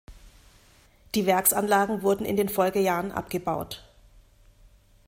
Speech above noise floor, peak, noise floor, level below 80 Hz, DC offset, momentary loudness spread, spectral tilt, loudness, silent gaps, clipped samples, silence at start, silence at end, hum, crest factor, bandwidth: 33 dB; -6 dBFS; -57 dBFS; -54 dBFS; under 0.1%; 10 LU; -4 dB/octave; -25 LUFS; none; under 0.1%; 0.1 s; 1.25 s; none; 22 dB; 16.5 kHz